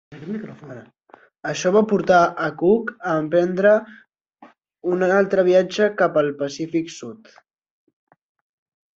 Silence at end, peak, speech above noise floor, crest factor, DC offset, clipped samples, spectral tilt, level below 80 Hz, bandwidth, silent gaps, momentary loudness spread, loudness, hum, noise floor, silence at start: 1.8 s; -4 dBFS; 32 dB; 18 dB; under 0.1%; under 0.1%; -6 dB/octave; -62 dBFS; 7.8 kHz; 4.21-4.25 s; 16 LU; -19 LUFS; none; -51 dBFS; 0.1 s